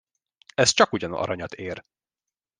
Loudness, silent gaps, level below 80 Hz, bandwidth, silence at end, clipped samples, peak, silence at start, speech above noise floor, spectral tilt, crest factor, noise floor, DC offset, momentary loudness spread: -23 LUFS; none; -60 dBFS; 10.5 kHz; 0.8 s; under 0.1%; -2 dBFS; 0.6 s; 66 dB; -2.5 dB/octave; 24 dB; -90 dBFS; under 0.1%; 17 LU